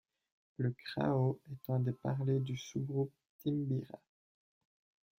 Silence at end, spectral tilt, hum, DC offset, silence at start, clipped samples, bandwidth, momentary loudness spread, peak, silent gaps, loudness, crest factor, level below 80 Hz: 1.2 s; -8 dB/octave; none; under 0.1%; 0.6 s; under 0.1%; 16 kHz; 9 LU; -20 dBFS; 3.29-3.39 s; -37 LUFS; 18 dB; -72 dBFS